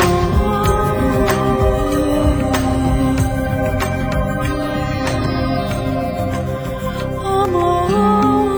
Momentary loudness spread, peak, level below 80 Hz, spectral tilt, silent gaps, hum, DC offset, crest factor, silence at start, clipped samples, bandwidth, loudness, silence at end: 6 LU; -2 dBFS; -24 dBFS; -6.5 dB/octave; none; none; under 0.1%; 14 dB; 0 s; under 0.1%; over 20 kHz; -17 LUFS; 0 s